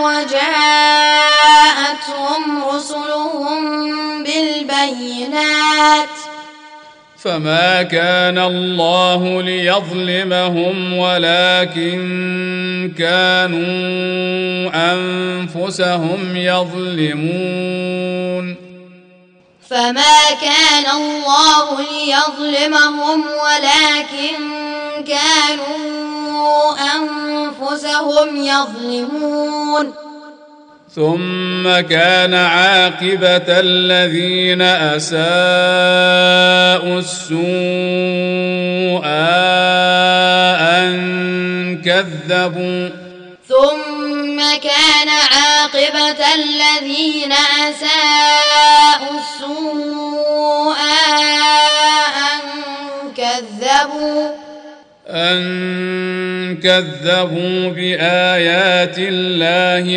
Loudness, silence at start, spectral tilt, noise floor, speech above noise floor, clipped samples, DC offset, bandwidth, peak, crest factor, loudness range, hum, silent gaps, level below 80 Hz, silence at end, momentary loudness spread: -13 LUFS; 0 s; -3 dB/octave; -48 dBFS; 34 dB; under 0.1%; under 0.1%; 10.5 kHz; 0 dBFS; 14 dB; 7 LU; none; none; -62 dBFS; 0 s; 11 LU